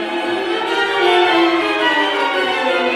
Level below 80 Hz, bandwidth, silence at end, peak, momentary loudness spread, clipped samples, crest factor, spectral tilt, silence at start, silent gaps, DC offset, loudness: -62 dBFS; 13 kHz; 0 s; -2 dBFS; 6 LU; under 0.1%; 14 dB; -3 dB/octave; 0 s; none; under 0.1%; -15 LUFS